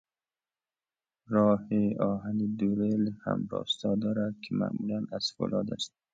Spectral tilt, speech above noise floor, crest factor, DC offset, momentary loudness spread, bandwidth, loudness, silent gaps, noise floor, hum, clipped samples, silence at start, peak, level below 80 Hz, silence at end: -6.5 dB/octave; over 61 dB; 18 dB; under 0.1%; 7 LU; 7.8 kHz; -30 LUFS; none; under -90 dBFS; none; under 0.1%; 1.3 s; -14 dBFS; -64 dBFS; 0.25 s